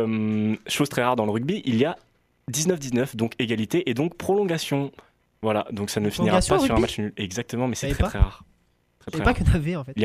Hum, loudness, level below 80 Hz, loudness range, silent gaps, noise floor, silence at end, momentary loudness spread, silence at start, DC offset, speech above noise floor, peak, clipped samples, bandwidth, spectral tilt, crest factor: none; -24 LUFS; -34 dBFS; 2 LU; none; -63 dBFS; 0 s; 8 LU; 0 s; under 0.1%; 40 dB; -4 dBFS; under 0.1%; 15.5 kHz; -5.5 dB/octave; 20 dB